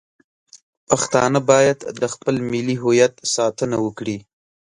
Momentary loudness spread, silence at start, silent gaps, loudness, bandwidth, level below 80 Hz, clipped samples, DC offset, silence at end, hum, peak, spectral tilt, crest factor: 10 LU; 0.55 s; 0.62-0.87 s; -19 LUFS; 11.5 kHz; -58 dBFS; under 0.1%; under 0.1%; 0.55 s; none; 0 dBFS; -4.5 dB/octave; 20 dB